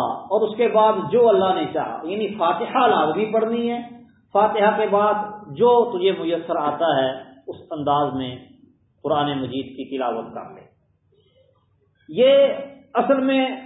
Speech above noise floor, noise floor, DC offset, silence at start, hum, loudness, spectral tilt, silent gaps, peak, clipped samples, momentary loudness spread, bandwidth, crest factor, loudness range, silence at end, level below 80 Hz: 43 dB; -63 dBFS; under 0.1%; 0 s; none; -20 LUFS; -10.5 dB/octave; none; -4 dBFS; under 0.1%; 15 LU; 4 kHz; 16 dB; 9 LU; 0 s; -62 dBFS